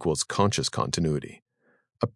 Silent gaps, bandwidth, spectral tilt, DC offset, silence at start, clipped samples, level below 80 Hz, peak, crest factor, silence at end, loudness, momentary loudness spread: 1.42-1.46 s; 12 kHz; -4.5 dB/octave; under 0.1%; 0 s; under 0.1%; -54 dBFS; -8 dBFS; 20 dB; 0.05 s; -27 LUFS; 8 LU